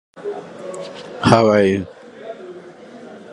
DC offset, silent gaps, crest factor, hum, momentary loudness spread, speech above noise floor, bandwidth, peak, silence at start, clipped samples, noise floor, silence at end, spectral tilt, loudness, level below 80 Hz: under 0.1%; none; 20 dB; none; 25 LU; 21 dB; 11.5 kHz; 0 dBFS; 0.15 s; under 0.1%; -38 dBFS; 0 s; -6.5 dB/octave; -16 LUFS; -48 dBFS